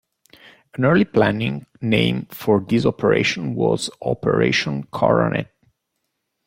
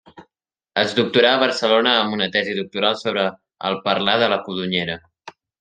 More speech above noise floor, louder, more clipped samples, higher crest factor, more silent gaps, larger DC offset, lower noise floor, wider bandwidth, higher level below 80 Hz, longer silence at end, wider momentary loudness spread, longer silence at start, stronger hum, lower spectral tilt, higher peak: about the same, 57 dB vs 58 dB; about the same, -20 LUFS vs -19 LUFS; neither; about the same, 18 dB vs 20 dB; neither; neither; about the same, -76 dBFS vs -77 dBFS; first, 16.5 kHz vs 9.4 kHz; first, -52 dBFS vs -64 dBFS; first, 1.05 s vs 0.3 s; about the same, 9 LU vs 10 LU; first, 0.8 s vs 0.15 s; neither; first, -6 dB/octave vs -4.5 dB/octave; about the same, -2 dBFS vs -2 dBFS